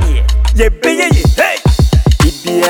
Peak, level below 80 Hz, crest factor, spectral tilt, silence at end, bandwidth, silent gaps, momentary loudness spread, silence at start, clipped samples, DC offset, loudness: 0 dBFS; -12 dBFS; 10 dB; -5.5 dB/octave; 0 s; 17.5 kHz; none; 3 LU; 0 s; under 0.1%; under 0.1%; -11 LUFS